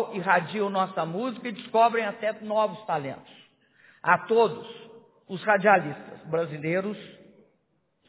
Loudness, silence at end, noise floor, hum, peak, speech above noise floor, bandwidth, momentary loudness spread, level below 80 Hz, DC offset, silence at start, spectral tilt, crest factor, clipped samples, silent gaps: -26 LUFS; 0.95 s; -72 dBFS; none; -4 dBFS; 46 dB; 4 kHz; 18 LU; -76 dBFS; under 0.1%; 0 s; -9.5 dB/octave; 22 dB; under 0.1%; none